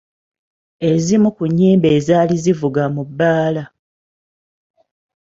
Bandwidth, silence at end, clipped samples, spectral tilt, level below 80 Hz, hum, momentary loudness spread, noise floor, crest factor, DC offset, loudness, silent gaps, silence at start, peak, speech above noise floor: 7.8 kHz; 1.65 s; under 0.1%; -7 dB/octave; -54 dBFS; none; 8 LU; under -90 dBFS; 16 dB; under 0.1%; -15 LUFS; none; 0.8 s; -2 dBFS; over 76 dB